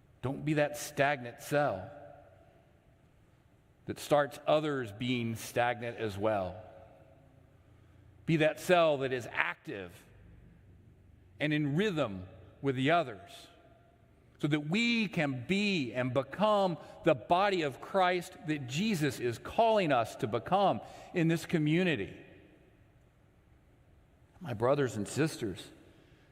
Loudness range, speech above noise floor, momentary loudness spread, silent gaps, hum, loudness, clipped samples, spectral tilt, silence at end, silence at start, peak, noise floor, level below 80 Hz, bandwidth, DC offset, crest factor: 6 LU; 33 dB; 14 LU; none; none; -32 LUFS; under 0.1%; -5.5 dB/octave; 0.55 s; 0.25 s; -8 dBFS; -64 dBFS; -66 dBFS; 16 kHz; under 0.1%; 24 dB